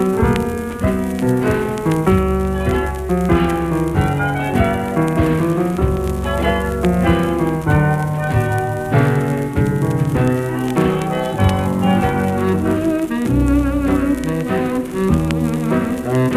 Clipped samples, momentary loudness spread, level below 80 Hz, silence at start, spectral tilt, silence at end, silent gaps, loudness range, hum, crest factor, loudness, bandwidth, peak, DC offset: under 0.1%; 4 LU; -28 dBFS; 0 s; -7.5 dB/octave; 0 s; none; 1 LU; none; 14 dB; -17 LUFS; 15.5 kHz; -2 dBFS; under 0.1%